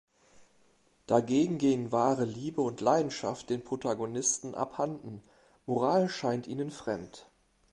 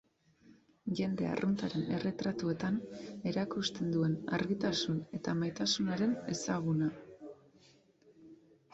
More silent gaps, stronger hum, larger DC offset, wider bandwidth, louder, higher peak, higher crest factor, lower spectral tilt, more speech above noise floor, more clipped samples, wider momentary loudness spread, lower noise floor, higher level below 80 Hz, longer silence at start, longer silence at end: neither; neither; neither; first, 11.5 kHz vs 8 kHz; first, -31 LUFS vs -35 LUFS; first, -10 dBFS vs -20 dBFS; first, 22 dB vs 16 dB; about the same, -5 dB/octave vs -5.5 dB/octave; first, 37 dB vs 31 dB; neither; first, 10 LU vs 7 LU; about the same, -67 dBFS vs -65 dBFS; about the same, -68 dBFS vs -68 dBFS; second, 0.4 s vs 0.85 s; about the same, 0.5 s vs 0.4 s